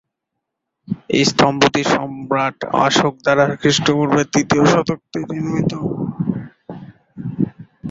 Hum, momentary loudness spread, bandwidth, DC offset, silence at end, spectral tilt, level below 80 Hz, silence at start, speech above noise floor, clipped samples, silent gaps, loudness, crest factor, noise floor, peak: none; 16 LU; 8 kHz; under 0.1%; 0 s; -5 dB/octave; -50 dBFS; 0.9 s; 62 dB; under 0.1%; none; -17 LUFS; 18 dB; -79 dBFS; 0 dBFS